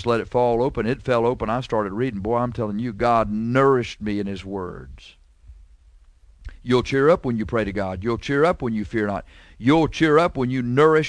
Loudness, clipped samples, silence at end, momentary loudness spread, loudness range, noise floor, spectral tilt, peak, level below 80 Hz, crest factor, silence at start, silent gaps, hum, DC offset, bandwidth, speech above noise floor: -22 LUFS; under 0.1%; 0 s; 9 LU; 4 LU; -51 dBFS; -7 dB/octave; -4 dBFS; -42 dBFS; 18 dB; 0 s; none; none; under 0.1%; 10.5 kHz; 30 dB